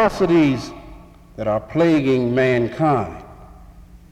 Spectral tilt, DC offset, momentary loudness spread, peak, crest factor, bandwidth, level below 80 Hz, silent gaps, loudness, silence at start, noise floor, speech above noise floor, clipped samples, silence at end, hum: -7.5 dB/octave; under 0.1%; 16 LU; -6 dBFS; 14 dB; 12 kHz; -44 dBFS; none; -18 LUFS; 0 s; -43 dBFS; 25 dB; under 0.1%; 0.15 s; none